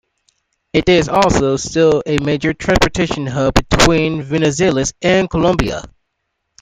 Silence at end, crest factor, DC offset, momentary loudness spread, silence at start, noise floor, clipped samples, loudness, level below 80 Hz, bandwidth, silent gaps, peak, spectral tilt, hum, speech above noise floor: 0.75 s; 16 dB; under 0.1%; 6 LU; 0.75 s; -72 dBFS; under 0.1%; -15 LUFS; -30 dBFS; 16 kHz; none; 0 dBFS; -5 dB/octave; none; 58 dB